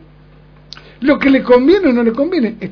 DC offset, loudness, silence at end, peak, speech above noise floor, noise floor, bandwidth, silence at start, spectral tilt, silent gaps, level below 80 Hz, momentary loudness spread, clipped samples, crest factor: under 0.1%; -12 LUFS; 0 s; 0 dBFS; 31 dB; -42 dBFS; 5.4 kHz; 1 s; -7.5 dB/octave; none; -44 dBFS; 7 LU; 0.1%; 14 dB